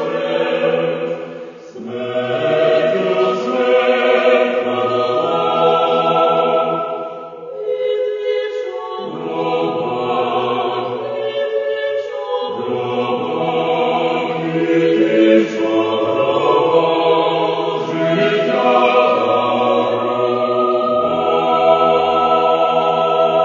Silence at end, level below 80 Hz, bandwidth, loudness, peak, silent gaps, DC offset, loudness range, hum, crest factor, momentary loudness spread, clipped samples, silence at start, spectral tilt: 0 s; -62 dBFS; 7.4 kHz; -16 LUFS; 0 dBFS; none; under 0.1%; 5 LU; none; 16 dB; 9 LU; under 0.1%; 0 s; -6.5 dB/octave